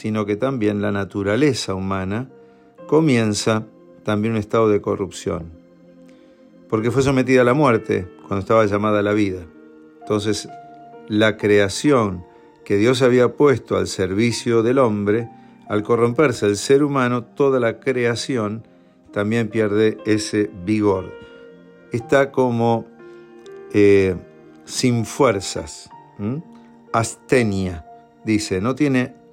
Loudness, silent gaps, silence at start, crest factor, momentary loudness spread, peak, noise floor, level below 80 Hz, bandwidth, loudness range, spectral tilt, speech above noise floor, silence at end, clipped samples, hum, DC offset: -19 LUFS; none; 0 s; 16 dB; 13 LU; -4 dBFS; -48 dBFS; -54 dBFS; 15 kHz; 4 LU; -5.5 dB/octave; 29 dB; 0.2 s; under 0.1%; none; under 0.1%